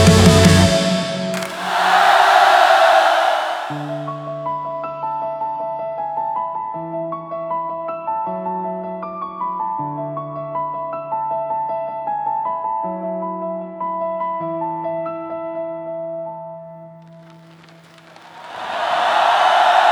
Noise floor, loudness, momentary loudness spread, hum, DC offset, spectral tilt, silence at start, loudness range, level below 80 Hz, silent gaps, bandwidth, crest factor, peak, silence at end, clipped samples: -45 dBFS; -19 LUFS; 16 LU; none; under 0.1%; -4.5 dB/octave; 0 s; 13 LU; -46 dBFS; none; 19.5 kHz; 18 dB; 0 dBFS; 0 s; under 0.1%